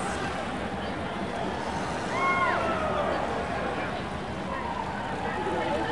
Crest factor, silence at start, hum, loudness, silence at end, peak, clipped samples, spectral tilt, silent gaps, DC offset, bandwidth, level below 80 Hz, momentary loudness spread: 16 dB; 0 s; none; -30 LUFS; 0 s; -14 dBFS; under 0.1%; -5 dB/octave; none; 0.4%; 11.5 kHz; -48 dBFS; 7 LU